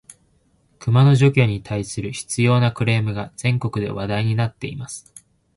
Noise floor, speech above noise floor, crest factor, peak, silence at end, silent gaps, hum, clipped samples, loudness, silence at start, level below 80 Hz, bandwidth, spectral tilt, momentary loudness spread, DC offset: -61 dBFS; 42 dB; 16 dB; -4 dBFS; 0.55 s; none; none; under 0.1%; -20 LUFS; 0.8 s; -48 dBFS; 11.5 kHz; -6 dB/octave; 15 LU; under 0.1%